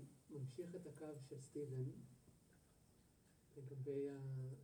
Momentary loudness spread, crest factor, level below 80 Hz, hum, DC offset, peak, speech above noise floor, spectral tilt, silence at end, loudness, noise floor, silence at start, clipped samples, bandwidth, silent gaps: 14 LU; 16 dB; -82 dBFS; none; under 0.1%; -36 dBFS; 23 dB; -8 dB/octave; 0 s; -51 LUFS; -73 dBFS; 0 s; under 0.1%; 19.5 kHz; none